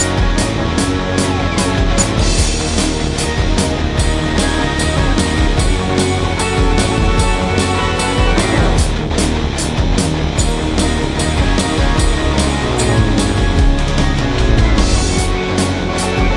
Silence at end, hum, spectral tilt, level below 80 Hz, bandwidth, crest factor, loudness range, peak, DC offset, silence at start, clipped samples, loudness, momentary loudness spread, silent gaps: 0 s; none; -4.5 dB/octave; -18 dBFS; 11.5 kHz; 14 dB; 1 LU; 0 dBFS; under 0.1%; 0 s; under 0.1%; -15 LUFS; 3 LU; none